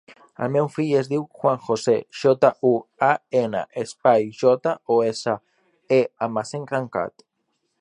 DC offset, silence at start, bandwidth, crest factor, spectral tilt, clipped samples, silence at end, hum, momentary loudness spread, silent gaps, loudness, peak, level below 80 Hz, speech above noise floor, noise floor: under 0.1%; 0.4 s; 11 kHz; 20 dB; -6 dB/octave; under 0.1%; 0.7 s; none; 9 LU; none; -22 LUFS; -2 dBFS; -68 dBFS; 52 dB; -74 dBFS